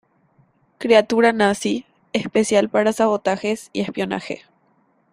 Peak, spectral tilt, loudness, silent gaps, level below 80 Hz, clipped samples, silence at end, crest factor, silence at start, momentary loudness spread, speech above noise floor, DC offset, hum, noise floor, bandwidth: -2 dBFS; -4.5 dB/octave; -19 LUFS; none; -60 dBFS; under 0.1%; 0.75 s; 20 dB; 0.8 s; 12 LU; 43 dB; under 0.1%; none; -61 dBFS; 15 kHz